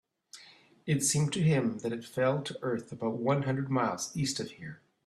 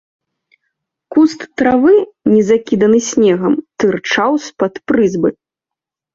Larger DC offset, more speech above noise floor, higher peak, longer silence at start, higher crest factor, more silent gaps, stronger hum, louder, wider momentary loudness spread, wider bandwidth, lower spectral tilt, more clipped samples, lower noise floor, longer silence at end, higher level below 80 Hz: neither; second, 27 dB vs 72 dB; second, -16 dBFS vs 0 dBFS; second, 0.35 s vs 1.1 s; about the same, 16 dB vs 14 dB; neither; neither; second, -31 LUFS vs -13 LUFS; first, 18 LU vs 6 LU; first, 14 kHz vs 7.8 kHz; about the same, -5 dB/octave vs -5.5 dB/octave; neither; second, -57 dBFS vs -84 dBFS; second, 0.3 s vs 0.8 s; second, -66 dBFS vs -52 dBFS